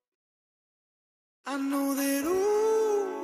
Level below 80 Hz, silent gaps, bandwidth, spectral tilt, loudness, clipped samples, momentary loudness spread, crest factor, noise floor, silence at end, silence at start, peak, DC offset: -70 dBFS; none; 15.5 kHz; -3 dB/octave; -27 LUFS; under 0.1%; 9 LU; 12 dB; under -90 dBFS; 0 s; 1.45 s; -18 dBFS; under 0.1%